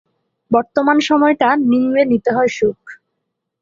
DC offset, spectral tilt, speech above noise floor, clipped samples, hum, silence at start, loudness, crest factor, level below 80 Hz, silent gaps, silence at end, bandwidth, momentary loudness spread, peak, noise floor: under 0.1%; -5.5 dB/octave; 61 dB; under 0.1%; none; 0.5 s; -15 LUFS; 14 dB; -58 dBFS; none; 0.65 s; 7.6 kHz; 6 LU; -2 dBFS; -75 dBFS